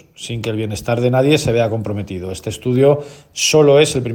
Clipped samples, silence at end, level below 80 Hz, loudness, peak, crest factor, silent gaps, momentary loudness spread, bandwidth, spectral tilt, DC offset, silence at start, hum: under 0.1%; 0 s; -46 dBFS; -16 LUFS; 0 dBFS; 16 dB; none; 14 LU; 18 kHz; -5 dB/octave; under 0.1%; 0.2 s; none